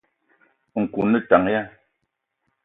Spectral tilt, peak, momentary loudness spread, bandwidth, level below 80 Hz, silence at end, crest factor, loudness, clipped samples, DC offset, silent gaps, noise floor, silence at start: -10 dB/octave; 0 dBFS; 13 LU; 4 kHz; -58 dBFS; 0.95 s; 22 dB; -21 LUFS; under 0.1%; under 0.1%; none; -77 dBFS; 0.75 s